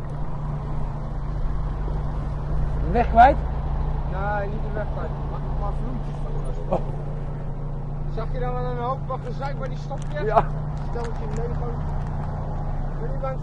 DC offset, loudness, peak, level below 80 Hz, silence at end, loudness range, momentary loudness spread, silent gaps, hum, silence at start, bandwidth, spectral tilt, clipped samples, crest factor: under 0.1%; -27 LUFS; -2 dBFS; -28 dBFS; 0 s; 7 LU; 9 LU; none; none; 0 s; 7.6 kHz; -8.5 dB/octave; under 0.1%; 22 dB